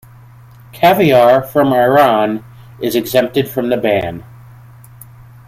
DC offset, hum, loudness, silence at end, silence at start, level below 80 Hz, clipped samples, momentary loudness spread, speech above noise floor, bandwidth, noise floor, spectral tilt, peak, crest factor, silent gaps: under 0.1%; none; -13 LUFS; 1.25 s; 0.75 s; -48 dBFS; under 0.1%; 12 LU; 27 dB; 16 kHz; -40 dBFS; -6 dB/octave; 0 dBFS; 14 dB; none